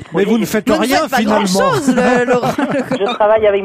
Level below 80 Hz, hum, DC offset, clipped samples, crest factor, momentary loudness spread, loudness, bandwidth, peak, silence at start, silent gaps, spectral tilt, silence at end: -46 dBFS; none; under 0.1%; under 0.1%; 12 dB; 5 LU; -14 LUFS; 16 kHz; -2 dBFS; 0 s; none; -5 dB/octave; 0 s